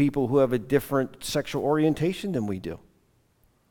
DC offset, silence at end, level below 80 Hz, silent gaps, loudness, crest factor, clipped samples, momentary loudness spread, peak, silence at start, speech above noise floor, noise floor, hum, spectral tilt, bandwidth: under 0.1%; 0.95 s; -54 dBFS; none; -26 LUFS; 18 dB; under 0.1%; 10 LU; -8 dBFS; 0 s; 40 dB; -65 dBFS; none; -6.5 dB/octave; 18 kHz